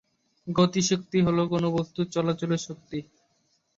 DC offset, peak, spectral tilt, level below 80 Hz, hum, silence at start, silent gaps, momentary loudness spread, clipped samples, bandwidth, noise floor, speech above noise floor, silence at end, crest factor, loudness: under 0.1%; -8 dBFS; -5.5 dB/octave; -58 dBFS; none; 0.45 s; none; 14 LU; under 0.1%; 7.8 kHz; -70 dBFS; 45 dB; 0.75 s; 18 dB; -26 LUFS